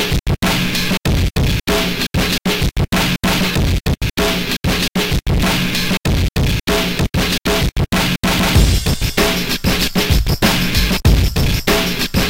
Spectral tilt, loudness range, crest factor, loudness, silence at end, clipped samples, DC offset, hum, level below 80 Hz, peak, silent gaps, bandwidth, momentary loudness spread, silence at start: -4.5 dB/octave; 2 LU; 14 dB; -16 LUFS; 0 s; under 0.1%; 0.9%; none; -22 dBFS; 0 dBFS; none; 17 kHz; 3 LU; 0 s